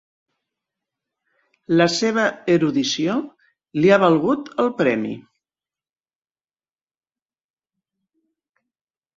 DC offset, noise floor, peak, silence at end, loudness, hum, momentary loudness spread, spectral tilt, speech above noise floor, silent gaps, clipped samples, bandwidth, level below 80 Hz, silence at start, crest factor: under 0.1%; under -90 dBFS; -2 dBFS; 3.95 s; -19 LUFS; none; 13 LU; -5 dB/octave; over 72 dB; none; under 0.1%; 8 kHz; -64 dBFS; 1.7 s; 20 dB